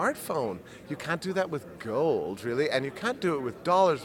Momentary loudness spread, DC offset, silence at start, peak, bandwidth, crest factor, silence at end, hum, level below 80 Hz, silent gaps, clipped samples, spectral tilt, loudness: 10 LU; under 0.1%; 0 s; -10 dBFS; 17.5 kHz; 18 dB; 0 s; none; -64 dBFS; none; under 0.1%; -5.5 dB/octave; -29 LUFS